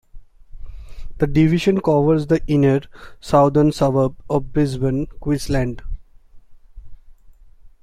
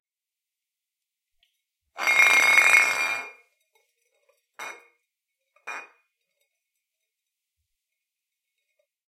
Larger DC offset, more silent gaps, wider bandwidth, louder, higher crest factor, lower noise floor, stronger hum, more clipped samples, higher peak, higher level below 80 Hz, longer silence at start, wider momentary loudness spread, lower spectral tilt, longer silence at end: neither; neither; second, 14 kHz vs 16.5 kHz; about the same, -18 LUFS vs -18 LUFS; second, 18 dB vs 28 dB; second, -44 dBFS vs -90 dBFS; neither; neither; about the same, -2 dBFS vs 0 dBFS; first, -34 dBFS vs -84 dBFS; second, 0.15 s vs 1.95 s; second, 9 LU vs 24 LU; first, -7.5 dB/octave vs 1.5 dB/octave; second, 0.15 s vs 3.3 s